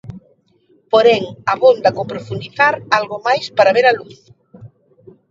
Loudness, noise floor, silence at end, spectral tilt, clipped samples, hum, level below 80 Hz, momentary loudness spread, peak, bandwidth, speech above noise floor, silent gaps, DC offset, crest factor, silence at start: -15 LUFS; -56 dBFS; 0.65 s; -5 dB/octave; under 0.1%; none; -56 dBFS; 13 LU; 0 dBFS; 7.6 kHz; 41 dB; none; under 0.1%; 16 dB; 0.05 s